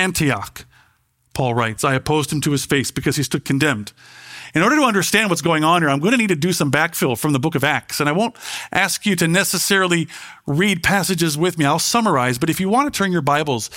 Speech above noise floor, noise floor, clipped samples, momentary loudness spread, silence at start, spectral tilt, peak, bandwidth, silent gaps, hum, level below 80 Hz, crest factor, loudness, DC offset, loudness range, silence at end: 43 dB; -61 dBFS; under 0.1%; 8 LU; 0 s; -4 dB/octave; 0 dBFS; 16.5 kHz; none; none; -50 dBFS; 18 dB; -18 LUFS; under 0.1%; 3 LU; 0 s